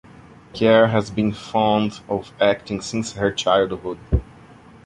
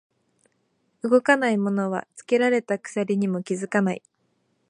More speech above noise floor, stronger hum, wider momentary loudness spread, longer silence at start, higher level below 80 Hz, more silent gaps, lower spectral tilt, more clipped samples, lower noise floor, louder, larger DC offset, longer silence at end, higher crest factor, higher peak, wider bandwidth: second, 26 dB vs 47 dB; neither; about the same, 11 LU vs 9 LU; second, 0.55 s vs 1.05 s; first, -36 dBFS vs -76 dBFS; neither; about the same, -5.5 dB/octave vs -6 dB/octave; neither; second, -46 dBFS vs -70 dBFS; first, -20 LUFS vs -23 LUFS; neither; about the same, 0.6 s vs 0.7 s; about the same, 18 dB vs 22 dB; about the same, -2 dBFS vs -2 dBFS; about the same, 11 kHz vs 10.5 kHz